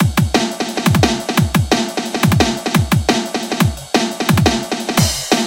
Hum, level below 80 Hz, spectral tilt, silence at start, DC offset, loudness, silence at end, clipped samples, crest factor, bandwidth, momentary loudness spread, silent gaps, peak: none; -32 dBFS; -4.5 dB/octave; 0 s; under 0.1%; -16 LUFS; 0 s; under 0.1%; 16 dB; 17 kHz; 4 LU; none; 0 dBFS